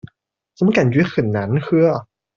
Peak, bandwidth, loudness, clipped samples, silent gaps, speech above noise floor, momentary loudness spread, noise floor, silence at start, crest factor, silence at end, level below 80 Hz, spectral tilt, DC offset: -2 dBFS; 7.2 kHz; -17 LUFS; under 0.1%; none; 41 dB; 5 LU; -57 dBFS; 0.05 s; 16 dB; 0.35 s; -54 dBFS; -8 dB/octave; under 0.1%